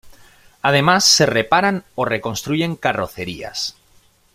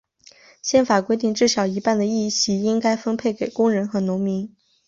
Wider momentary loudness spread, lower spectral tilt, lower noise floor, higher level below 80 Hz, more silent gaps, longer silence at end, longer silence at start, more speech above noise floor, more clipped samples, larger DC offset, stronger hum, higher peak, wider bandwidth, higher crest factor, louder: first, 14 LU vs 6 LU; second, -3 dB/octave vs -4.5 dB/octave; about the same, -54 dBFS vs -51 dBFS; first, -52 dBFS vs -62 dBFS; neither; first, 0.65 s vs 0.4 s; second, 0.05 s vs 0.65 s; first, 36 dB vs 31 dB; neither; neither; neither; about the same, -2 dBFS vs -4 dBFS; first, 16 kHz vs 7.8 kHz; about the same, 18 dB vs 16 dB; first, -17 LUFS vs -21 LUFS